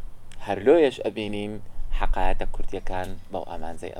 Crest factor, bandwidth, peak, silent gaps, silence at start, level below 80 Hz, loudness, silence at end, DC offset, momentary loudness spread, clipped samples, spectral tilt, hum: 16 dB; 9.8 kHz; -6 dBFS; none; 0 s; -28 dBFS; -26 LUFS; 0 s; under 0.1%; 17 LU; under 0.1%; -6.5 dB/octave; none